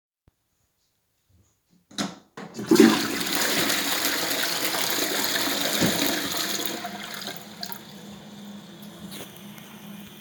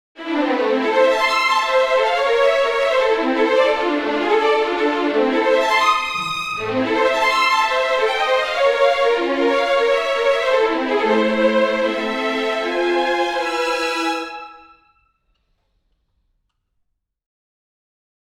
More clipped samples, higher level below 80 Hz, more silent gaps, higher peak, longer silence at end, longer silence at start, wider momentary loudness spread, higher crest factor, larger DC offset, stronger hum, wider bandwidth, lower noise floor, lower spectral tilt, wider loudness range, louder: neither; second, -64 dBFS vs -56 dBFS; neither; about the same, -2 dBFS vs -4 dBFS; second, 0 s vs 3.65 s; first, 1.95 s vs 0.2 s; first, 21 LU vs 5 LU; first, 26 dB vs 16 dB; neither; neither; first, over 20 kHz vs 14.5 kHz; about the same, -72 dBFS vs -71 dBFS; about the same, -2.5 dB/octave vs -3 dB/octave; first, 12 LU vs 6 LU; second, -23 LUFS vs -17 LUFS